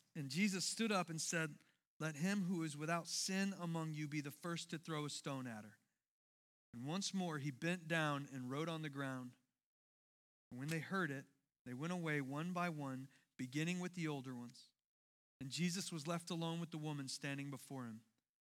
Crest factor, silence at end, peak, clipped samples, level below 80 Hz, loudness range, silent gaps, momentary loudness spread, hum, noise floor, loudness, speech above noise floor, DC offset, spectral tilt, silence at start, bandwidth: 20 dB; 0.4 s; -24 dBFS; under 0.1%; under -90 dBFS; 5 LU; 1.87-2.00 s, 6.08-6.73 s, 9.64-10.51 s, 11.59-11.65 s, 14.84-15.40 s; 13 LU; none; under -90 dBFS; -43 LUFS; over 46 dB; under 0.1%; -4.5 dB/octave; 0.15 s; 16.5 kHz